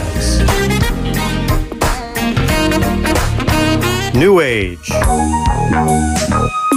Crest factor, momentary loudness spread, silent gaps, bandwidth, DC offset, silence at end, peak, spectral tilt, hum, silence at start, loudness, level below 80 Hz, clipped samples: 12 dB; 6 LU; none; 16 kHz; under 0.1%; 0 s; 0 dBFS; -5 dB/octave; none; 0 s; -14 LUFS; -20 dBFS; under 0.1%